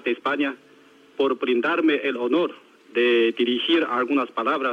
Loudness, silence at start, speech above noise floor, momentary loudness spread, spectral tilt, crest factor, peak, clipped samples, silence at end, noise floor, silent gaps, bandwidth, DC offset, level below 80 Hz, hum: -22 LUFS; 0.05 s; 30 dB; 8 LU; -5 dB/octave; 14 dB; -8 dBFS; under 0.1%; 0 s; -52 dBFS; none; 6.6 kHz; under 0.1%; -82 dBFS; none